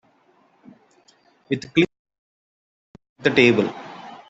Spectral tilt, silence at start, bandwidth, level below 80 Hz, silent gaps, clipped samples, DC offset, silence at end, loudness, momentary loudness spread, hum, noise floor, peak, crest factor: -6 dB/octave; 1.5 s; 8 kHz; -62 dBFS; 1.99-2.05 s, 2.18-2.94 s, 3.09-3.16 s; under 0.1%; under 0.1%; 0.15 s; -20 LUFS; 16 LU; none; -60 dBFS; -2 dBFS; 22 dB